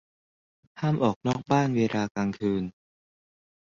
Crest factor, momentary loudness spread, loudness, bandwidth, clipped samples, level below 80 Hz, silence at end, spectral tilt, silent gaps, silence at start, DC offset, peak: 20 dB; 7 LU; -27 LUFS; 7.6 kHz; under 0.1%; -60 dBFS; 0.9 s; -7 dB/octave; 1.16-1.21 s, 2.11-2.15 s; 0.75 s; under 0.1%; -10 dBFS